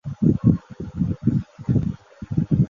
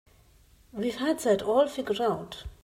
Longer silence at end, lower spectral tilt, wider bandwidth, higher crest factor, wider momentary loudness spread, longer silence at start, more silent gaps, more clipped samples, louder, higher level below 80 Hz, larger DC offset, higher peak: about the same, 0.05 s vs 0.1 s; first, -11 dB/octave vs -5 dB/octave; second, 7 kHz vs 16 kHz; about the same, 18 dB vs 16 dB; about the same, 10 LU vs 12 LU; second, 0.05 s vs 0.75 s; neither; neither; first, -23 LUFS vs -28 LUFS; first, -38 dBFS vs -54 dBFS; neither; first, -4 dBFS vs -12 dBFS